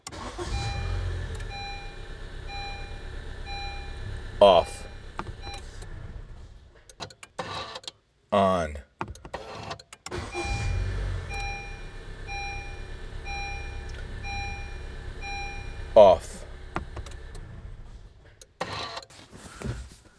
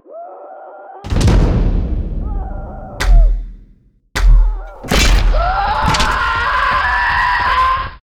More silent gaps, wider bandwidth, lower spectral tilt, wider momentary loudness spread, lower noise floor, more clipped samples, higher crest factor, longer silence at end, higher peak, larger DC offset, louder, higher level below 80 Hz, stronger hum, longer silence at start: neither; second, 11 kHz vs 15 kHz; about the same, -5 dB/octave vs -4.5 dB/octave; about the same, 20 LU vs 19 LU; first, -52 dBFS vs -48 dBFS; neither; first, 26 dB vs 12 dB; about the same, 0.2 s vs 0.15 s; about the same, -4 dBFS vs -2 dBFS; neither; second, -28 LUFS vs -15 LUFS; second, -38 dBFS vs -16 dBFS; neither; about the same, 0.05 s vs 0.1 s